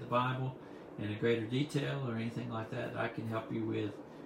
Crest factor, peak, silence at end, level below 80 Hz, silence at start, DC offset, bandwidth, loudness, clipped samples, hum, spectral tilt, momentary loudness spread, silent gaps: 18 dB; -18 dBFS; 0 s; -70 dBFS; 0 s; under 0.1%; 13.5 kHz; -37 LUFS; under 0.1%; none; -7 dB/octave; 9 LU; none